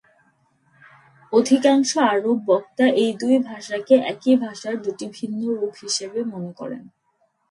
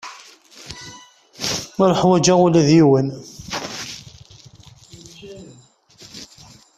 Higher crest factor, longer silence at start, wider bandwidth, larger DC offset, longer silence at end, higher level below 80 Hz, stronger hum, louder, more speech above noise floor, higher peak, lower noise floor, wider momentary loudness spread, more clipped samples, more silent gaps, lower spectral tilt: about the same, 18 dB vs 18 dB; first, 1.3 s vs 0.05 s; second, 11.5 kHz vs 14 kHz; neither; first, 0.7 s vs 0.55 s; second, -72 dBFS vs -54 dBFS; neither; second, -21 LUFS vs -17 LUFS; first, 47 dB vs 35 dB; about the same, -2 dBFS vs -2 dBFS; first, -67 dBFS vs -50 dBFS; second, 13 LU vs 26 LU; neither; neither; second, -4 dB/octave vs -5.5 dB/octave